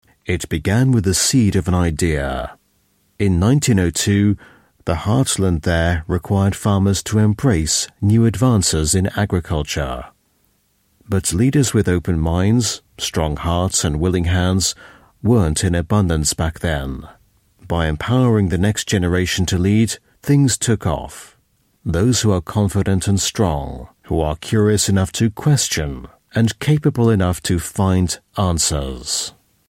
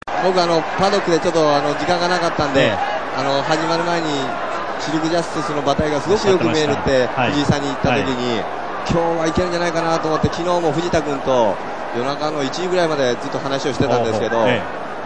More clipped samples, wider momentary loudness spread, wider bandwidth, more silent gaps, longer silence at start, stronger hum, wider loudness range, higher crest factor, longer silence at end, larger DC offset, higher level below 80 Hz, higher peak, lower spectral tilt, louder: neither; first, 9 LU vs 6 LU; first, 16 kHz vs 10 kHz; neither; first, 0.3 s vs 0 s; neither; about the same, 2 LU vs 2 LU; about the same, 14 dB vs 18 dB; first, 0.4 s vs 0 s; second, under 0.1% vs 2%; first, -32 dBFS vs -42 dBFS; second, -4 dBFS vs 0 dBFS; about the same, -5 dB/octave vs -5 dB/octave; about the same, -18 LUFS vs -18 LUFS